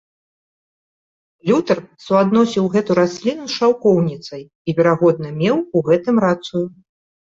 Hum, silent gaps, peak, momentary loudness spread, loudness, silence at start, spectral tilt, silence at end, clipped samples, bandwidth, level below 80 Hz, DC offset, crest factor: none; 4.55-4.65 s; -2 dBFS; 10 LU; -17 LUFS; 1.45 s; -7 dB/octave; 0.55 s; under 0.1%; 7.8 kHz; -58 dBFS; under 0.1%; 16 dB